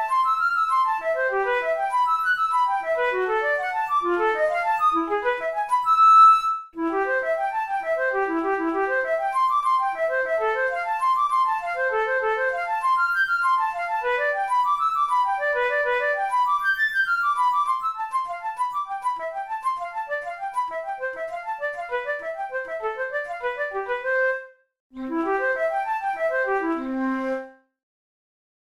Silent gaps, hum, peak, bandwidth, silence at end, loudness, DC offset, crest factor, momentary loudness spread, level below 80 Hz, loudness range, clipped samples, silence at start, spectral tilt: 24.80-24.90 s; none; -6 dBFS; 15.5 kHz; 1.1 s; -23 LUFS; 0.1%; 16 dB; 8 LU; -60 dBFS; 10 LU; under 0.1%; 0 s; -3 dB/octave